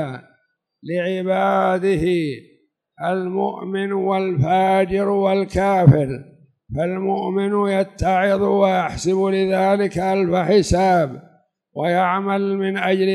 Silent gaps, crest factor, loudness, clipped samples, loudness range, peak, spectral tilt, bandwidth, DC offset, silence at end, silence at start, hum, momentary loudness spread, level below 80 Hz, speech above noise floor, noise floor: none; 18 dB; -19 LUFS; under 0.1%; 3 LU; 0 dBFS; -7 dB/octave; 12 kHz; under 0.1%; 0 s; 0 s; none; 9 LU; -42 dBFS; 47 dB; -65 dBFS